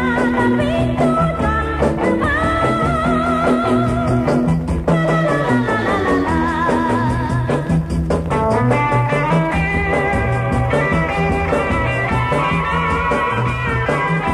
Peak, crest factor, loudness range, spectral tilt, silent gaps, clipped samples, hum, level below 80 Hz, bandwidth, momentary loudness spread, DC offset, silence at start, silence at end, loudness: -4 dBFS; 12 dB; 1 LU; -7 dB/octave; none; under 0.1%; none; -30 dBFS; 12 kHz; 3 LU; under 0.1%; 0 s; 0 s; -17 LUFS